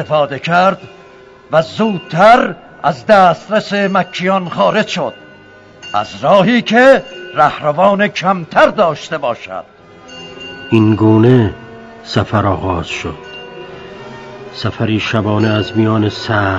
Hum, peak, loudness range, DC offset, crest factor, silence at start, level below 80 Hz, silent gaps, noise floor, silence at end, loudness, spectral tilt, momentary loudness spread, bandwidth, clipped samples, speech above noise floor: none; 0 dBFS; 7 LU; under 0.1%; 14 dB; 0 s; -46 dBFS; none; -39 dBFS; 0 s; -13 LUFS; -6.5 dB/octave; 21 LU; 9.2 kHz; 0.5%; 27 dB